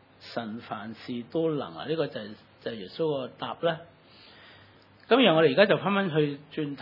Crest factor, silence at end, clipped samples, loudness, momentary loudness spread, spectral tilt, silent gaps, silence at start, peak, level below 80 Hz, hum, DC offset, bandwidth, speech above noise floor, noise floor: 24 dB; 0 s; under 0.1%; -27 LUFS; 17 LU; -8 dB/octave; none; 0.2 s; -4 dBFS; -76 dBFS; none; under 0.1%; 5.8 kHz; 28 dB; -55 dBFS